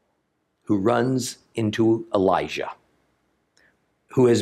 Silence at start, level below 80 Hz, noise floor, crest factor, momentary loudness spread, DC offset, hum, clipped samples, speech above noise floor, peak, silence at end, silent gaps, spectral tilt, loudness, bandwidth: 0.7 s; -64 dBFS; -72 dBFS; 18 dB; 10 LU; under 0.1%; none; under 0.1%; 51 dB; -6 dBFS; 0 s; none; -6 dB/octave; -23 LUFS; 14 kHz